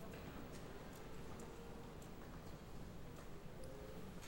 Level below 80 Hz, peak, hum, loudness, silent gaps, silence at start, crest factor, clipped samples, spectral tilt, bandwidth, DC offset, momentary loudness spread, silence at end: -60 dBFS; -40 dBFS; none; -55 LUFS; none; 0 s; 12 dB; under 0.1%; -5.5 dB/octave; 18 kHz; under 0.1%; 3 LU; 0 s